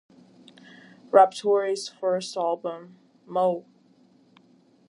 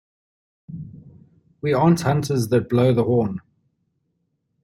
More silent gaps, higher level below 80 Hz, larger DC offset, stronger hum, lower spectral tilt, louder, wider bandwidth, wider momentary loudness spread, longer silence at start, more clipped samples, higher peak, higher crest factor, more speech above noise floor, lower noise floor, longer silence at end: neither; second, -84 dBFS vs -56 dBFS; neither; neither; second, -4.5 dB/octave vs -7.5 dB/octave; second, -24 LUFS vs -20 LUFS; second, 11.5 kHz vs 14 kHz; second, 15 LU vs 20 LU; first, 1.15 s vs 0.7 s; neither; about the same, -4 dBFS vs -4 dBFS; first, 24 dB vs 18 dB; second, 36 dB vs 53 dB; second, -59 dBFS vs -72 dBFS; about the same, 1.3 s vs 1.25 s